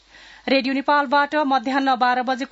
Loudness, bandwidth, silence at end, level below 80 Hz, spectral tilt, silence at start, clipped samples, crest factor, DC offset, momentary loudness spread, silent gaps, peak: -20 LUFS; 8 kHz; 0.05 s; -64 dBFS; -4 dB/octave; 0.45 s; under 0.1%; 14 dB; under 0.1%; 3 LU; none; -6 dBFS